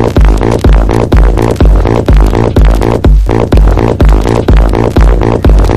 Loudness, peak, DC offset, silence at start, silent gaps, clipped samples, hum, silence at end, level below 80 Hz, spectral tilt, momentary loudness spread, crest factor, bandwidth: -8 LUFS; 0 dBFS; 1%; 0 s; none; 0.6%; none; 0 s; -6 dBFS; -7.5 dB/octave; 1 LU; 4 dB; 11.5 kHz